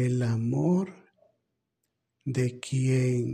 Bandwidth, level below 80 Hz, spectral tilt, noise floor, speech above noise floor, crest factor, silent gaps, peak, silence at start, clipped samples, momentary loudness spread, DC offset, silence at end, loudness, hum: 10 kHz; -62 dBFS; -7.5 dB/octave; -81 dBFS; 55 dB; 14 dB; none; -14 dBFS; 0 s; under 0.1%; 9 LU; under 0.1%; 0 s; -28 LUFS; none